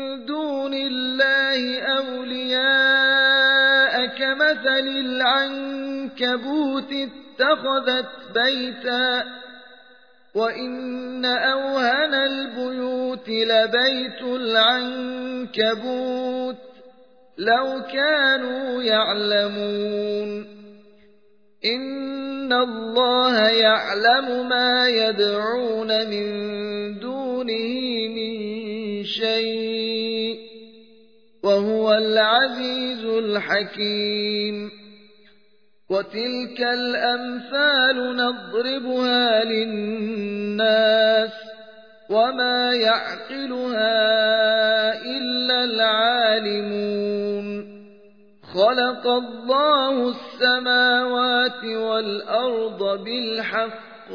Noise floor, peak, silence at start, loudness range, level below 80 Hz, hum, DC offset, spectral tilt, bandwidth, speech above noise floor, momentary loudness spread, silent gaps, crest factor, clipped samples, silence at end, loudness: -63 dBFS; -4 dBFS; 0 s; 7 LU; -78 dBFS; none; 0.1%; -4.5 dB/octave; 5.4 kHz; 42 dB; 12 LU; none; 16 dB; under 0.1%; 0 s; -21 LUFS